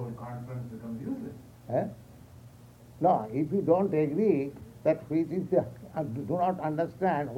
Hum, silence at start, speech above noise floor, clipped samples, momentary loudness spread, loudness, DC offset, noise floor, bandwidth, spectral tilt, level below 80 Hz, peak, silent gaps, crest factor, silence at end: 60 Hz at -55 dBFS; 0 s; 24 dB; under 0.1%; 13 LU; -30 LUFS; under 0.1%; -52 dBFS; 16.5 kHz; -9 dB/octave; -62 dBFS; -12 dBFS; none; 18 dB; 0 s